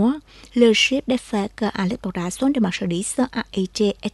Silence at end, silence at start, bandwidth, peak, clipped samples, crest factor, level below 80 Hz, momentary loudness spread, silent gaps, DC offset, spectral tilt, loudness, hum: 0.05 s; 0 s; 12 kHz; -4 dBFS; under 0.1%; 18 dB; -50 dBFS; 10 LU; none; under 0.1%; -4.5 dB/octave; -21 LUFS; none